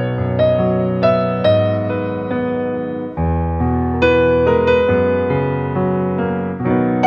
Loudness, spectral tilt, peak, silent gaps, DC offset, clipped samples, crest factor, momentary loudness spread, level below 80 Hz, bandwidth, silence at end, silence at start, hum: -17 LUFS; -9 dB/octave; -2 dBFS; none; under 0.1%; under 0.1%; 14 dB; 7 LU; -34 dBFS; 6.8 kHz; 0 s; 0 s; none